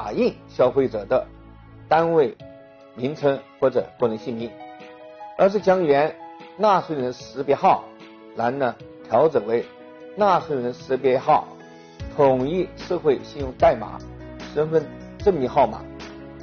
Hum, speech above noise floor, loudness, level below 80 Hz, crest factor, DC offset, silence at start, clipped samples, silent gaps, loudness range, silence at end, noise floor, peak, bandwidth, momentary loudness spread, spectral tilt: none; 25 dB; -22 LUFS; -48 dBFS; 16 dB; under 0.1%; 0 s; under 0.1%; none; 2 LU; 0 s; -45 dBFS; -6 dBFS; 6.8 kHz; 19 LU; -5 dB/octave